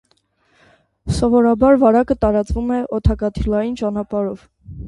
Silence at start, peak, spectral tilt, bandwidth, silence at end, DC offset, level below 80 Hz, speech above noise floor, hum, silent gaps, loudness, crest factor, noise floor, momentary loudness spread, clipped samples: 1.05 s; -2 dBFS; -8 dB/octave; 11.5 kHz; 0 s; under 0.1%; -30 dBFS; 45 dB; none; none; -17 LUFS; 16 dB; -61 dBFS; 11 LU; under 0.1%